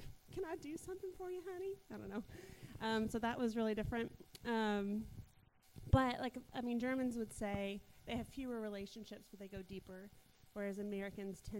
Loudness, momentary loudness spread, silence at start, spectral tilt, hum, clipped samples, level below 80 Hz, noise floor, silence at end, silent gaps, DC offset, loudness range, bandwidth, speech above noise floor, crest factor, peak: -43 LUFS; 16 LU; 0 s; -6 dB/octave; none; under 0.1%; -56 dBFS; -68 dBFS; 0 s; none; under 0.1%; 7 LU; 16 kHz; 26 dB; 26 dB; -16 dBFS